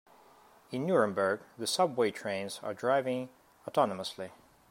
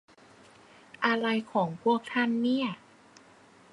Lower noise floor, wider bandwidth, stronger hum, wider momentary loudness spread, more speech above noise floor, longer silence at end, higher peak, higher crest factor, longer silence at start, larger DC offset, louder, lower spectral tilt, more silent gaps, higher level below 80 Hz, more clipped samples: about the same, -60 dBFS vs -57 dBFS; first, 16 kHz vs 10.5 kHz; neither; first, 14 LU vs 4 LU; about the same, 29 dB vs 29 dB; second, 0.35 s vs 1 s; about the same, -12 dBFS vs -10 dBFS; about the same, 20 dB vs 20 dB; second, 0.7 s vs 1 s; neither; second, -32 LUFS vs -28 LUFS; second, -4.5 dB/octave vs -6 dB/octave; neither; about the same, -78 dBFS vs -78 dBFS; neither